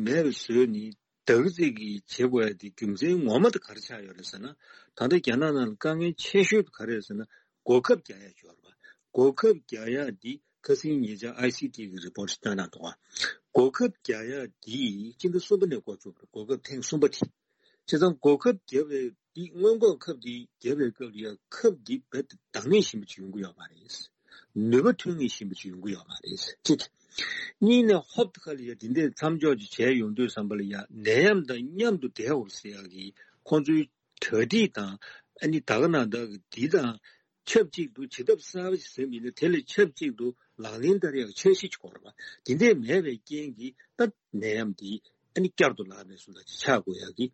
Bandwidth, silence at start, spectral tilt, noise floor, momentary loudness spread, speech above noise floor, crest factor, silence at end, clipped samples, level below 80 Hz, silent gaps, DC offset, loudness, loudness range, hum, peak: 8.6 kHz; 0 s; -5 dB/octave; -69 dBFS; 18 LU; 42 dB; 20 dB; 0.05 s; under 0.1%; -72 dBFS; none; under 0.1%; -27 LUFS; 4 LU; none; -8 dBFS